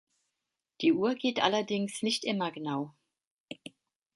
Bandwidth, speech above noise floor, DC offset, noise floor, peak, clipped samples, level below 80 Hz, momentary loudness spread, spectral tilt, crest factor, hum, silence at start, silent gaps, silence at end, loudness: 11.5 kHz; 57 dB; under 0.1%; -87 dBFS; -10 dBFS; under 0.1%; -78 dBFS; 19 LU; -4.5 dB/octave; 22 dB; none; 0.8 s; 3.31-3.48 s; 0.6 s; -30 LUFS